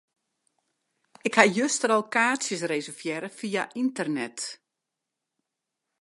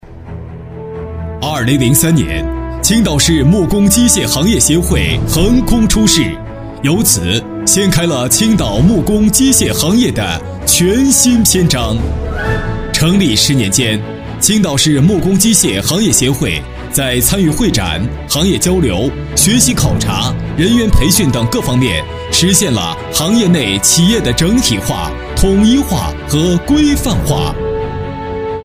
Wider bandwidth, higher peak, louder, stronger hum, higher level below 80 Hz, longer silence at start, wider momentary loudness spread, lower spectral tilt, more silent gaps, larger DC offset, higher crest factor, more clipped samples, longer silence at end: second, 11.5 kHz vs 16.5 kHz; about the same, 0 dBFS vs 0 dBFS; second, -26 LUFS vs -11 LUFS; neither; second, -78 dBFS vs -24 dBFS; first, 1.25 s vs 0.05 s; first, 13 LU vs 10 LU; about the same, -3 dB/octave vs -4 dB/octave; neither; neither; first, 28 dB vs 12 dB; neither; first, 1.45 s vs 0 s